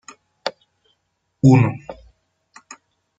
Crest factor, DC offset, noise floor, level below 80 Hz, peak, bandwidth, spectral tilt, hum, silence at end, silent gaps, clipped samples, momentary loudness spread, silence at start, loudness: 20 dB; under 0.1%; -71 dBFS; -54 dBFS; -2 dBFS; 7.8 kHz; -7.5 dB/octave; none; 1.25 s; none; under 0.1%; 21 LU; 0.45 s; -18 LUFS